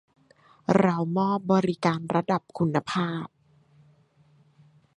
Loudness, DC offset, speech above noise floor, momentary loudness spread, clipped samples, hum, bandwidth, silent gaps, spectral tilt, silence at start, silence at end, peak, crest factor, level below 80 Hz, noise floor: -26 LUFS; under 0.1%; 36 dB; 9 LU; under 0.1%; none; 9.8 kHz; none; -7.5 dB/octave; 0.7 s; 1.7 s; -6 dBFS; 22 dB; -66 dBFS; -61 dBFS